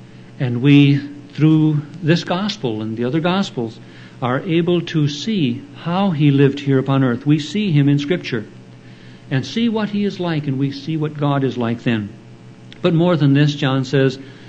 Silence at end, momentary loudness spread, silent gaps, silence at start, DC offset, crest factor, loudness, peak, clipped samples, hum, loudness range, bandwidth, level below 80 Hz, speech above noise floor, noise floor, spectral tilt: 0 s; 10 LU; none; 0 s; under 0.1%; 16 dB; -18 LUFS; 0 dBFS; under 0.1%; none; 4 LU; 8 kHz; -58 dBFS; 23 dB; -40 dBFS; -7.5 dB/octave